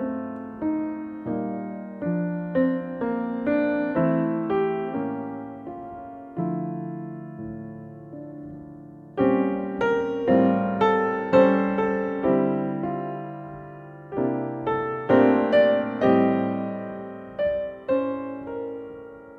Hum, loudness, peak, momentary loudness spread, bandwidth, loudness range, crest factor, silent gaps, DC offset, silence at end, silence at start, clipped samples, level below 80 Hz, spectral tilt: none; -24 LUFS; -6 dBFS; 19 LU; 6.6 kHz; 9 LU; 20 dB; none; under 0.1%; 0 s; 0 s; under 0.1%; -58 dBFS; -9 dB/octave